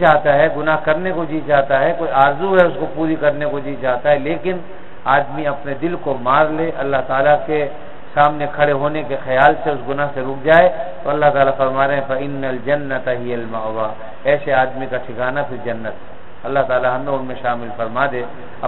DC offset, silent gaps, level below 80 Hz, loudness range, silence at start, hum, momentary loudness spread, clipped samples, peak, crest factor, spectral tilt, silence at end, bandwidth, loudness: 5%; none; -48 dBFS; 5 LU; 0 s; none; 11 LU; under 0.1%; 0 dBFS; 18 dB; -8.5 dB/octave; 0 s; 4.2 kHz; -17 LUFS